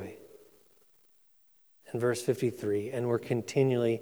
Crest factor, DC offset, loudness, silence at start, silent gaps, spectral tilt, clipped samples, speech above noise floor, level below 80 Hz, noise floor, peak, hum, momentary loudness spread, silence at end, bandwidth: 20 dB; under 0.1%; -31 LUFS; 0 s; none; -6.5 dB/octave; under 0.1%; 37 dB; -76 dBFS; -66 dBFS; -14 dBFS; none; 12 LU; 0 s; over 20 kHz